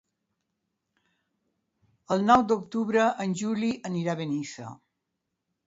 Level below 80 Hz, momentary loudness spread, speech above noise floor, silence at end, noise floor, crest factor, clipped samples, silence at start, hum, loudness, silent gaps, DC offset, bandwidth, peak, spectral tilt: -66 dBFS; 13 LU; 57 dB; 0.95 s; -83 dBFS; 22 dB; under 0.1%; 2.1 s; none; -26 LUFS; none; under 0.1%; 8 kHz; -6 dBFS; -6 dB/octave